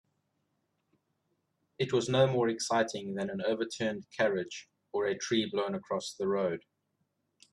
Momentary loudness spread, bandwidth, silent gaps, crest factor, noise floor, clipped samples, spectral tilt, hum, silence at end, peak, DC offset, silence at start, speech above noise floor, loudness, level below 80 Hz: 9 LU; 12 kHz; none; 20 dB; -80 dBFS; under 0.1%; -4.5 dB/octave; none; 0.95 s; -14 dBFS; under 0.1%; 1.8 s; 48 dB; -32 LUFS; -74 dBFS